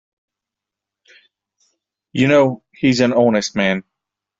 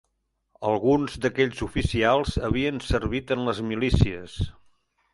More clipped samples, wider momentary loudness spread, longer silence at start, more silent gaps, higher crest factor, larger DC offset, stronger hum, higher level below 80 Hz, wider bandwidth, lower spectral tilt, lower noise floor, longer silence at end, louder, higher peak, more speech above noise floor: neither; about the same, 7 LU vs 9 LU; first, 2.15 s vs 0.6 s; neither; about the same, 18 dB vs 22 dB; neither; neither; second, -56 dBFS vs -36 dBFS; second, 7.8 kHz vs 11.5 kHz; about the same, -5.5 dB/octave vs -6.5 dB/octave; first, -85 dBFS vs -75 dBFS; about the same, 0.6 s vs 0.65 s; first, -16 LUFS vs -25 LUFS; about the same, -2 dBFS vs -4 dBFS; first, 70 dB vs 51 dB